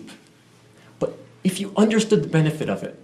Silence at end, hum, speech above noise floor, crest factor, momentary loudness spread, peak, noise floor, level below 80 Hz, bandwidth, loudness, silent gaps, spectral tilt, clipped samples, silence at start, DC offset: 0.05 s; none; 32 dB; 18 dB; 11 LU; -6 dBFS; -53 dBFS; -60 dBFS; 14 kHz; -22 LUFS; none; -6 dB/octave; under 0.1%; 0 s; under 0.1%